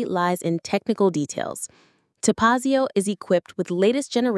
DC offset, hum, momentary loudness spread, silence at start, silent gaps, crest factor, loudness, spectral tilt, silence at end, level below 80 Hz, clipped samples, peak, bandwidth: under 0.1%; none; 9 LU; 0 s; none; 18 dB; -22 LUFS; -5 dB/octave; 0 s; -62 dBFS; under 0.1%; -4 dBFS; 12 kHz